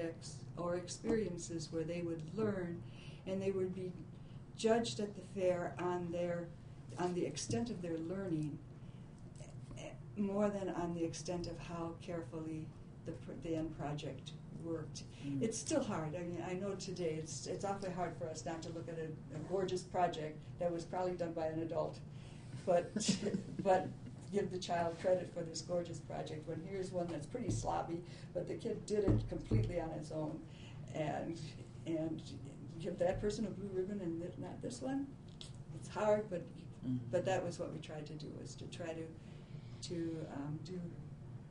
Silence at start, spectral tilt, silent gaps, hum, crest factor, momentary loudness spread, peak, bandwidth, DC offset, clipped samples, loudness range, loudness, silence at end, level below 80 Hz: 0 s; -6 dB/octave; none; none; 22 dB; 14 LU; -20 dBFS; 10.5 kHz; under 0.1%; under 0.1%; 5 LU; -41 LUFS; 0 s; -58 dBFS